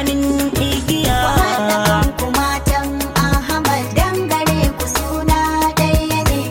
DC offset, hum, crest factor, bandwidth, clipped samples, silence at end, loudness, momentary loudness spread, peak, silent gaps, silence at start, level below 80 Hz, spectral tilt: under 0.1%; none; 14 dB; 17 kHz; under 0.1%; 0 s; -16 LUFS; 3 LU; -2 dBFS; none; 0 s; -24 dBFS; -4.5 dB/octave